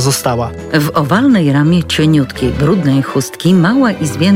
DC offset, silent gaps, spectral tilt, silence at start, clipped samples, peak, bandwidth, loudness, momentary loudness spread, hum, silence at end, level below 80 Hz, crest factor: under 0.1%; none; -5.5 dB/octave; 0 s; under 0.1%; 0 dBFS; 16.5 kHz; -12 LUFS; 6 LU; none; 0 s; -36 dBFS; 10 dB